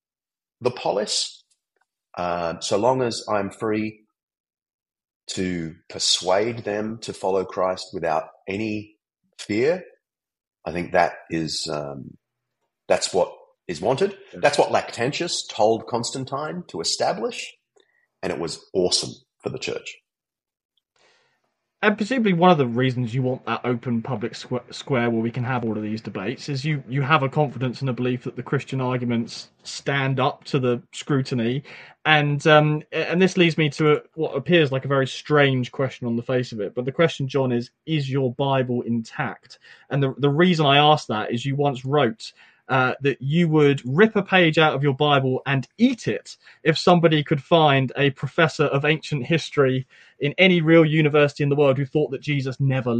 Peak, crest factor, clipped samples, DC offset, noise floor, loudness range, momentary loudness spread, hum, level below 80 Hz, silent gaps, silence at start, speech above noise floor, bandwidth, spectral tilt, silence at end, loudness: -2 dBFS; 20 dB; under 0.1%; under 0.1%; under -90 dBFS; 7 LU; 12 LU; none; -62 dBFS; 4.23-4.27 s, 4.40-4.44 s, 4.74-4.79 s, 5.16-5.20 s, 20.65-20.69 s; 0.6 s; over 68 dB; 11.5 kHz; -5.5 dB/octave; 0 s; -22 LUFS